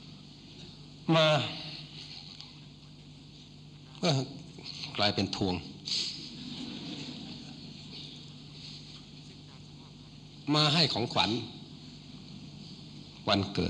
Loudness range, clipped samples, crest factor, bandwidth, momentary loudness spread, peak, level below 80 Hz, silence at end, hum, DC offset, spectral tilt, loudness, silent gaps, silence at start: 12 LU; under 0.1%; 24 dB; 10 kHz; 24 LU; -10 dBFS; -62 dBFS; 0 s; 50 Hz at -65 dBFS; under 0.1%; -5 dB/octave; -31 LUFS; none; 0 s